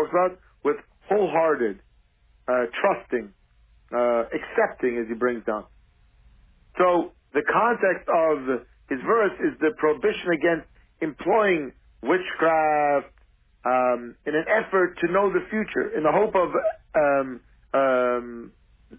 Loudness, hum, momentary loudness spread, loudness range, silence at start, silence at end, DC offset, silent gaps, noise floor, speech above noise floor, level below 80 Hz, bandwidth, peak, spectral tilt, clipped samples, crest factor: -24 LUFS; none; 10 LU; 3 LU; 0 s; 0.5 s; under 0.1%; none; -60 dBFS; 37 dB; -58 dBFS; 3.7 kHz; -8 dBFS; -9.5 dB/octave; under 0.1%; 16 dB